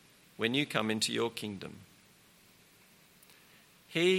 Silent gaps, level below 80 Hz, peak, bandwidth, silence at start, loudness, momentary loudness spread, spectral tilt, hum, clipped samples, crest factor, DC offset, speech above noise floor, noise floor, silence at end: none; -76 dBFS; -12 dBFS; 16.5 kHz; 0.4 s; -33 LUFS; 18 LU; -4 dB/octave; none; under 0.1%; 24 dB; under 0.1%; 28 dB; -62 dBFS; 0 s